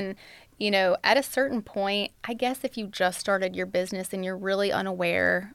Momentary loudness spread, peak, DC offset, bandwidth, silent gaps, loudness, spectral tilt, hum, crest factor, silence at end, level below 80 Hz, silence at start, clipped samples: 9 LU; -6 dBFS; under 0.1%; 16.5 kHz; none; -27 LUFS; -4 dB/octave; none; 20 dB; 0 s; -64 dBFS; 0 s; under 0.1%